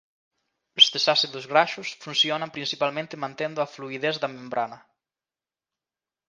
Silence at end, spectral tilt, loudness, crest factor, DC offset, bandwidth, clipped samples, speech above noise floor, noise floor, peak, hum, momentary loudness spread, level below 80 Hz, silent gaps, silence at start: 1.5 s; -2.5 dB/octave; -23 LUFS; 26 dB; under 0.1%; 9.8 kHz; under 0.1%; over 65 dB; under -90 dBFS; 0 dBFS; none; 14 LU; -78 dBFS; none; 0.75 s